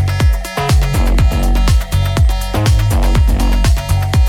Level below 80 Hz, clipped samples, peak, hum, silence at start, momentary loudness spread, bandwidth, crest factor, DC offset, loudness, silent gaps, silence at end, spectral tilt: -14 dBFS; under 0.1%; -2 dBFS; none; 0 s; 2 LU; 16 kHz; 8 dB; under 0.1%; -14 LUFS; none; 0 s; -5.5 dB/octave